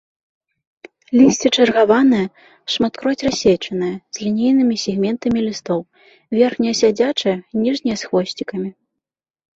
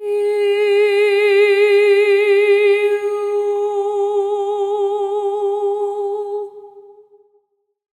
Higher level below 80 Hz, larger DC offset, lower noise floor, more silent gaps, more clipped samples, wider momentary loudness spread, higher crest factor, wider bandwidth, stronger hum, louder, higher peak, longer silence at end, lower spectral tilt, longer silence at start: first, -54 dBFS vs -76 dBFS; neither; first, -84 dBFS vs -64 dBFS; neither; neither; about the same, 11 LU vs 9 LU; first, 18 dB vs 12 dB; second, 8 kHz vs 11.5 kHz; neither; about the same, -17 LUFS vs -16 LUFS; first, 0 dBFS vs -4 dBFS; second, 0.85 s vs 1.2 s; first, -4.5 dB/octave vs -2.5 dB/octave; first, 1.1 s vs 0 s